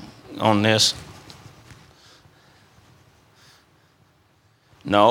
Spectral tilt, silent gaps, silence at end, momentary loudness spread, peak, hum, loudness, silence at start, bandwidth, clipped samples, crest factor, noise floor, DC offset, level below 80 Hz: -3.5 dB/octave; none; 0 s; 27 LU; -2 dBFS; none; -19 LUFS; 0 s; 16.5 kHz; under 0.1%; 24 dB; -60 dBFS; under 0.1%; -60 dBFS